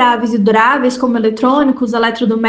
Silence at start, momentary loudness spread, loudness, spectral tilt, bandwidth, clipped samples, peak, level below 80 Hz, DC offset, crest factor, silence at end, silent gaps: 0 s; 4 LU; -12 LUFS; -5.5 dB/octave; 9.2 kHz; under 0.1%; 0 dBFS; -52 dBFS; under 0.1%; 12 dB; 0 s; none